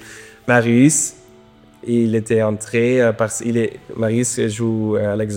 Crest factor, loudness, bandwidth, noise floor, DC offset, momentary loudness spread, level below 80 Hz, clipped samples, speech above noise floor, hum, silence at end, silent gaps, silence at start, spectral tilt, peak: 18 dB; -17 LUFS; 17 kHz; -47 dBFS; under 0.1%; 10 LU; -56 dBFS; under 0.1%; 30 dB; none; 0 s; none; 0 s; -5.5 dB/octave; 0 dBFS